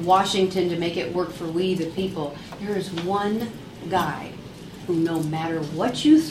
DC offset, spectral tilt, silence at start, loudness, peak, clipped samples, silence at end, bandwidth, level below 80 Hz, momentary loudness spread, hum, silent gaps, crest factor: under 0.1%; -5.5 dB/octave; 0 s; -24 LUFS; -6 dBFS; under 0.1%; 0 s; 15.5 kHz; -54 dBFS; 15 LU; none; none; 18 dB